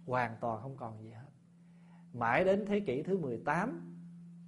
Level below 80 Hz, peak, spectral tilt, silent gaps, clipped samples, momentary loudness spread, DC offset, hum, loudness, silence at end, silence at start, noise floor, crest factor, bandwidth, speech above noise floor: -68 dBFS; -14 dBFS; -7.5 dB/octave; none; under 0.1%; 21 LU; under 0.1%; none; -34 LUFS; 0 s; 0 s; -59 dBFS; 22 dB; 11.5 kHz; 25 dB